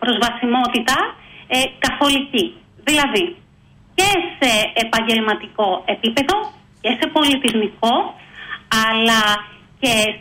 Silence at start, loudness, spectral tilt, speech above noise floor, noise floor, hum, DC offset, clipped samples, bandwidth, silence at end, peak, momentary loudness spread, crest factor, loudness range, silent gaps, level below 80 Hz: 0 s; -17 LUFS; -2.5 dB/octave; 32 dB; -49 dBFS; none; under 0.1%; under 0.1%; 16.5 kHz; 0 s; -4 dBFS; 10 LU; 16 dB; 1 LU; none; -48 dBFS